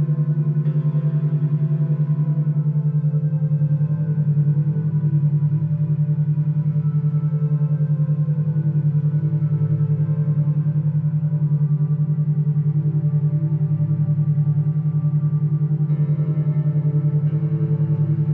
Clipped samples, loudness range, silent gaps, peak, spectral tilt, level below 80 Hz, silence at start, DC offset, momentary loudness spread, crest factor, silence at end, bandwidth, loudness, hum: under 0.1%; 0 LU; none; -10 dBFS; -14 dB/octave; -66 dBFS; 0 s; under 0.1%; 1 LU; 8 dB; 0 s; 1.9 kHz; -20 LUFS; none